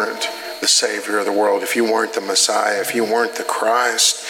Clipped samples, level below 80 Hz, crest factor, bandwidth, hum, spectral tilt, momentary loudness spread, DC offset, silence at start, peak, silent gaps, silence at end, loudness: under 0.1%; -82 dBFS; 18 dB; 17.5 kHz; none; -0.5 dB/octave; 6 LU; under 0.1%; 0 s; 0 dBFS; none; 0 s; -17 LUFS